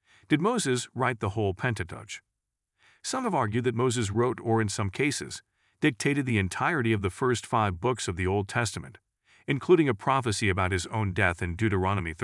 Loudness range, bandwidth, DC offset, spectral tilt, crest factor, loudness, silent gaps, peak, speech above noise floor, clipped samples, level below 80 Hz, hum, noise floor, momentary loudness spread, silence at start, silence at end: 3 LU; 12 kHz; under 0.1%; -5.5 dB/octave; 20 dB; -27 LUFS; none; -8 dBFS; 57 dB; under 0.1%; -58 dBFS; none; -84 dBFS; 8 LU; 0.3 s; 0 s